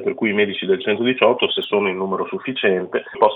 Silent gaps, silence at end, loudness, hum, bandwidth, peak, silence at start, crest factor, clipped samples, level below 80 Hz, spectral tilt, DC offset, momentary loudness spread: none; 0 s; -19 LUFS; none; 4.2 kHz; -2 dBFS; 0 s; 18 dB; under 0.1%; -72 dBFS; -8 dB/octave; under 0.1%; 7 LU